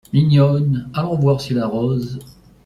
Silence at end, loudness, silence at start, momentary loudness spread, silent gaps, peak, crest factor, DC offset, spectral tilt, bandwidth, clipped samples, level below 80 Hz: 0.35 s; -17 LUFS; 0.15 s; 10 LU; none; -4 dBFS; 14 dB; under 0.1%; -8.5 dB/octave; 11.5 kHz; under 0.1%; -48 dBFS